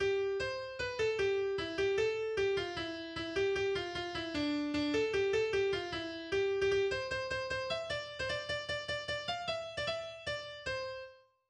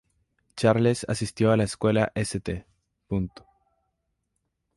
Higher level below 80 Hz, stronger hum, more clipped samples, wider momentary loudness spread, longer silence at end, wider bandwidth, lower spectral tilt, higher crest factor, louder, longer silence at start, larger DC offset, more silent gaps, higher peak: second, -60 dBFS vs -50 dBFS; neither; neither; second, 8 LU vs 13 LU; second, 0.3 s vs 1.5 s; second, 9.8 kHz vs 11.5 kHz; second, -4 dB/octave vs -6 dB/octave; second, 14 dB vs 20 dB; second, -35 LUFS vs -25 LUFS; second, 0 s vs 0.55 s; neither; neither; second, -22 dBFS vs -6 dBFS